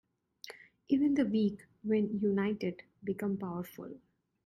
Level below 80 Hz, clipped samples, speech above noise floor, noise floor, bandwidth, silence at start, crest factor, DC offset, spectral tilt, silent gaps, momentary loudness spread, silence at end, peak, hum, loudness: -70 dBFS; under 0.1%; 21 dB; -54 dBFS; 14 kHz; 0.45 s; 16 dB; under 0.1%; -8 dB/octave; none; 20 LU; 0.5 s; -18 dBFS; none; -33 LUFS